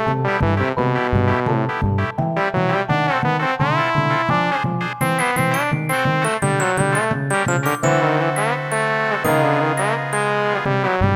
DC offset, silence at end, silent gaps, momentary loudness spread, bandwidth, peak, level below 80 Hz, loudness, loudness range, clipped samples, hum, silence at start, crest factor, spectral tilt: under 0.1%; 0 s; none; 3 LU; 17 kHz; -2 dBFS; -42 dBFS; -19 LUFS; 1 LU; under 0.1%; none; 0 s; 16 dB; -5.5 dB/octave